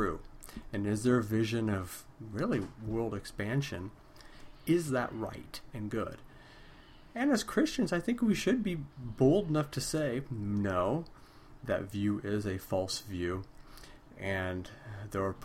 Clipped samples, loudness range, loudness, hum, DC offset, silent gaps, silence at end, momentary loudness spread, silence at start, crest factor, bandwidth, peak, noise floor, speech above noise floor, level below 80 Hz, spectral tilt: under 0.1%; 6 LU; -33 LUFS; none; under 0.1%; none; 0 s; 16 LU; 0 s; 20 dB; 16.5 kHz; -14 dBFS; -54 dBFS; 22 dB; -54 dBFS; -6 dB/octave